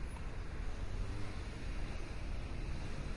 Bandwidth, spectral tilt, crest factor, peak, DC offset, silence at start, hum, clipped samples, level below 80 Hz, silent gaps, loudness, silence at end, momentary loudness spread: 11.5 kHz; -6 dB/octave; 12 dB; -28 dBFS; under 0.1%; 0 s; none; under 0.1%; -42 dBFS; none; -45 LUFS; 0 s; 2 LU